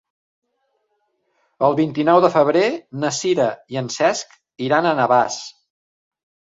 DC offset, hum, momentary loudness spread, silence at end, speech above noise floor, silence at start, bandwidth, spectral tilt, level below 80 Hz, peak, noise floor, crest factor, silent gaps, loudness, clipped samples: under 0.1%; none; 13 LU; 1.05 s; 52 dB; 1.6 s; 7.8 kHz; -4.5 dB/octave; -66 dBFS; -2 dBFS; -70 dBFS; 20 dB; none; -18 LUFS; under 0.1%